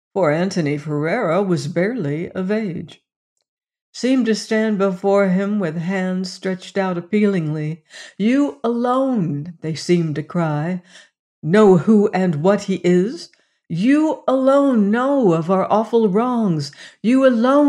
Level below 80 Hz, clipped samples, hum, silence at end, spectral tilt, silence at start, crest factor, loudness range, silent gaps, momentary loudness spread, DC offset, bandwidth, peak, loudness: -66 dBFS; under 0.1%; none; 0 s; -7 dB/octave; 0.15 s; 14 dB; 5 LU; 3.16-3.36 s, 3.48-3.57 s, 3.81-3.93 s, 11.19-11.42 s; 11 LU; under 0.1%; 10.5 kHz; -4 dBFS; -18 LUFS